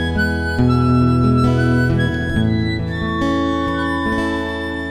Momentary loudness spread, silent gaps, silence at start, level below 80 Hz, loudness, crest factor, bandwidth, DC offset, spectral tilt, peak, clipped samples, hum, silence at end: 7 LU; none; 0 s; -30 dBFS; -17 LUFS; 14 dB; 10 kHz; 0.4%; -7.5 dB/octave; -4 dBFS; under 0.1%; none; 0 s